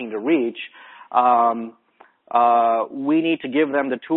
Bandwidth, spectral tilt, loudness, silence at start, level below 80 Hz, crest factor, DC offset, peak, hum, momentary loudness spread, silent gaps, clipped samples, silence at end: 4.1 kHz; -10 dB/octave; -20 LUFS; 0 s; -72 dBFS; 16 dB; under 0.1%; -4 dBFS; none; 13 LU; none; under 0.1%; 0 s